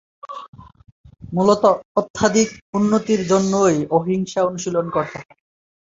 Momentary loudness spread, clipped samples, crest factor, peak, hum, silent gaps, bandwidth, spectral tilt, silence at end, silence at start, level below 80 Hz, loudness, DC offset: 16 LU; under 0.1%; 18 dB; -2 dBFS; none; 0.48-0.53 s, 0.92-1.04 s, 1.85-1.95 s, 2.10-2.14 s, 2.62-2.73 s; 7.8 kHz; -5.5 dB/octave; 0.7 s; 0.25 s; -54 dBFS; -19 LUFS; under 0.1%